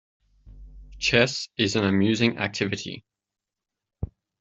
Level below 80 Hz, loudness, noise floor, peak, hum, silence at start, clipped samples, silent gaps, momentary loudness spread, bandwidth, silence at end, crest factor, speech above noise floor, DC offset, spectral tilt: -50 dBFS; -23 LUFS; -87 dBFS; -4 dBFS; none; 0.45 s; under 0.1%; none; 18 LU; 8.2 kHz; 0.35 s; 24 dB; 64 dB; under 0.1%; -4.5 dB/octave